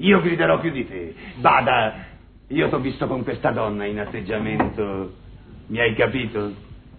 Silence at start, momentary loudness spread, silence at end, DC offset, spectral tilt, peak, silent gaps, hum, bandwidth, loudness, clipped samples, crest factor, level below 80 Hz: 0 s; 14 LU; 0 s; under 0.1%; -10 dB/octave; -4 dBFS; none; none; 4.5 kHz; -22 LUFS; under 0.1%; 18 dB; -44 dBFS